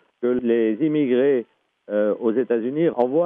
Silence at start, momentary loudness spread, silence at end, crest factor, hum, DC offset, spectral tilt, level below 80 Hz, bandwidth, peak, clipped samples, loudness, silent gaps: 0.2 s; 5 LU; 0 s; 14 dB; none; under 0.1%; -10.5 dB/octave; -68 dBFS; 3.8 kHz; -6 dBFS; under 0.1%; -21 LUFS; none